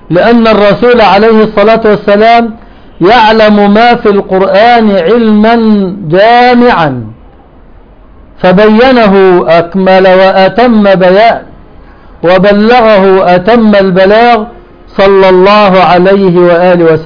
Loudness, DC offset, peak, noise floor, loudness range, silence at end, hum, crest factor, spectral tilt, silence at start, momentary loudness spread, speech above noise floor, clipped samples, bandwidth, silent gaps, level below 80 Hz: -4 LUFS; under 0.1%; 0 dBFS; -33 dBFS; 2 LU; 0 s; none; 4 dB; -8 dB/octave; 0.1 s; 5 LU; 30 dB; 6%; 5.4 kHz; none; -32 dBFS